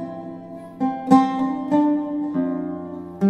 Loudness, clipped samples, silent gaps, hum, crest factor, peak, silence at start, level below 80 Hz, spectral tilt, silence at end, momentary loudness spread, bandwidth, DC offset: -21 LUFS; under 0.1%; none; none; 20 dB; -2 dBFS; 0 s; -64 dBFS; -8 dB/octave; 0 s; 18 LU; 8.8 kHz; under 0.1%